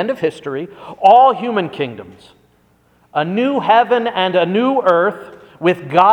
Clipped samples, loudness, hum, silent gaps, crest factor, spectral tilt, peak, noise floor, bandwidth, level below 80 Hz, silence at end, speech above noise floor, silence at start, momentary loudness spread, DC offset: under 0.1%; -15 LUFS; none; none; 16 dB; -6.5 dB/octave; 0 dBFS; -55 dBFS; 9.6 kHz; -62 dBFS; 0 s; 40 dB; 0 s; 15 LU; under 0.1%